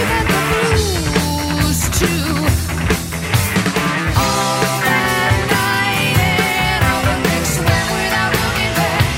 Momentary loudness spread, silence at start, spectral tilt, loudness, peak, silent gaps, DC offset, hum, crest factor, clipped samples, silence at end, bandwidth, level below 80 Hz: 3 LU; 0 s; -4 dB/octave; -15 LUFS; 0 dBFS; none; under 0.1%; none; 16 dB; under 0.1%; 0 s; 16.5 kHz; -28 dBFS